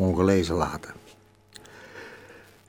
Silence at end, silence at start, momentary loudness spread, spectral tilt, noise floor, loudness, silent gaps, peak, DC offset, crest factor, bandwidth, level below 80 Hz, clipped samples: 0.35 s; 0 s; 25 LU; -6.5 dB/octave; -55 dBFS; -25 LUFS; none; -8 dBFS; under 0.1%; 20 dB; 16 kHz; -48 dBFS; under 0.1%